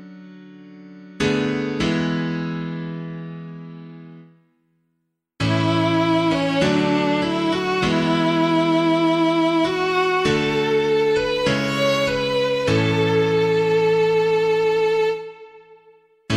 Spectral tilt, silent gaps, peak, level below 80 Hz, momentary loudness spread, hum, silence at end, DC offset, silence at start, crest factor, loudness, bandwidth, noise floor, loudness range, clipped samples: -6 dB/octave; none; -6 dBFS; -48 dBFS; 12 LU; none; 0 s; under 0.1%; 0 s; 16 dB; -19 LUFS; 13.5 kHz; -74 dBFS; 8 LU; under 0.1%